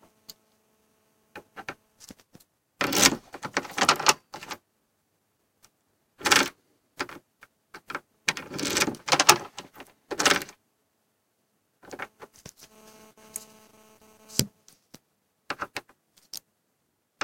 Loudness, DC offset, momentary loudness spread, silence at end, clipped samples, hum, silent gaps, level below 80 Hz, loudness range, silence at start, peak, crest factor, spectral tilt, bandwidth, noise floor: -24 LUFS; under 0.1%; 23 LU; 0.9 s; under 0.1%; none; none; -64 dBFS; 12 LU; 1.35 s; 0 dBFS; 32 dB; -1 dB/octave; 17 kHz; -75 dBFS